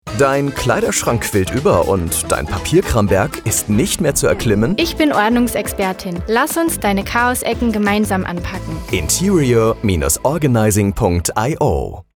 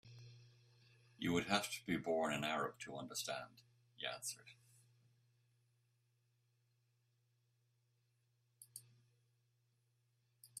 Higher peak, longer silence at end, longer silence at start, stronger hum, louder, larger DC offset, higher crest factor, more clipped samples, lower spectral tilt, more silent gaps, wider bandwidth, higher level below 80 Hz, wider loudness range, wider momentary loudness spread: first, -2 dBFS vs -20 dBFS; first, 0.15 s vs 0 s; about the same, 0.05 s vs 0.05 s; neither; first, -16 LUFS vs -42 LUFS; neither; second, 14 dB vs 28 dB; neither; about the same, -4.5 dB/octave vs -3.5 dB/octave; neither; first, 20 kHz vs 15 kHz; first, -30 dBFS vs -80 dBFS; second, 1 LU vs 24 LU; second, 5 LU vs 20 LU